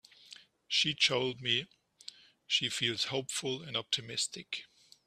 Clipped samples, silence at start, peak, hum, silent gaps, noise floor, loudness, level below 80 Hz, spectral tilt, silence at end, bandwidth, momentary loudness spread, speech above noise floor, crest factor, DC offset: under 0.1%; 0.3 s; -14 dBFS; none; none; -57 dBFS; -32 LUFS; -74 dBFS; -2 dB/octave; 0.4 s; 15 kHz; 22 LU; 23 dB; 22 dB; under 0.1%